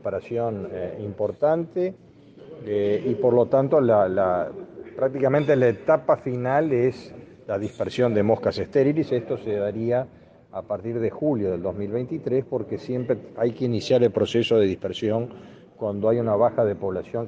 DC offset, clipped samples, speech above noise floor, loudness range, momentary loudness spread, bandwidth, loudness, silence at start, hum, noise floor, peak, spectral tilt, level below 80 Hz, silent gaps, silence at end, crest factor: under 0.1%; under 0.1%; 22 dB; 5 LU; 11 LU; 8 kHz; -23 LUFS; 0.05 s; none; -45 dBFS; -6 dBFS; -7.5 dB/octave; -64 dBFS; none; 0 s; 18 dB